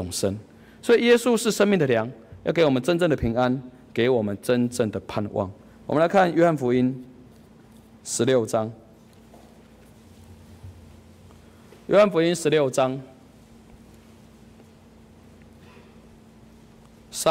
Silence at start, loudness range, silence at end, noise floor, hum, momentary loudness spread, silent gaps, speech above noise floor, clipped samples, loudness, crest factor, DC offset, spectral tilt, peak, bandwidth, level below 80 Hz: 0 s; 8 LU; 0 s; -51 dBFS; none; 15 LU; none; 29 dB; under 0.1%; -22 LUFS; 16 dB; under 0.1%; -5 dB/octave; -8 dBFS; 16 kHz; -54 dBFS